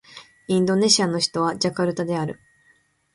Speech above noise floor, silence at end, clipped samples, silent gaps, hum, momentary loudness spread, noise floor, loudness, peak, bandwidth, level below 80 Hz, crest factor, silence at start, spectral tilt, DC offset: 40 dB; 0.8 s; under 0.1%; none; none; 13 LU; -61 dBFS; -21 LUFS; -2 dBFS; 11.5 kHz; -62 dBFS; 22 dB; 0.15 s; -4 dB/octave; under 0.1%